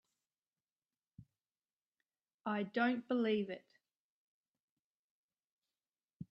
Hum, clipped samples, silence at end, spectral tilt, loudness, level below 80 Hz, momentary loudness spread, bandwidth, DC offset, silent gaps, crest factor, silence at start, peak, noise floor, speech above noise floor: none; under 0.1%; 0.05 s; -8 dB/octave; -38 LUFS; -84 dBFS; 14 LU; 5.8 kHz; under 0.1%; 1.73-1.90 s, 2.34-2.39 s, 3.99-5.29 s, 5.44-5.59 s, 6.04-6.20 s; 24 dB; 1.2 s; -20 dBFS; under -90 dBFS; over 53 dB